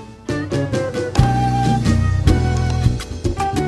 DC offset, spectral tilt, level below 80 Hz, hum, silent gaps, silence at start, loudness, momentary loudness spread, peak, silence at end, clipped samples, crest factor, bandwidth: under 0.1%; -6.5 dB/octave; -26 dBFS; none; none; 0 s; -18 LUFS; 7 LU; 0 dBFS; 0 s; under 0.1%; 16 dB; 12.5 kHz